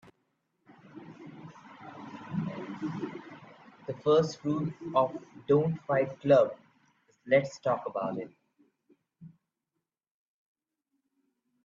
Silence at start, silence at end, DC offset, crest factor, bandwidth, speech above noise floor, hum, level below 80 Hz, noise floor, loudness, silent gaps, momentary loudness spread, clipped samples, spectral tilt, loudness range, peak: 0.95 s; 2.35 s; under 0.1%; 22 dB; 7.4 kHz; 59 dB; none; -72 dBFS; -87 dBFS; -30 LUFS; none; 24 LU; under 0.1%; -7 dB/octave; 13 LU; -10 dBFS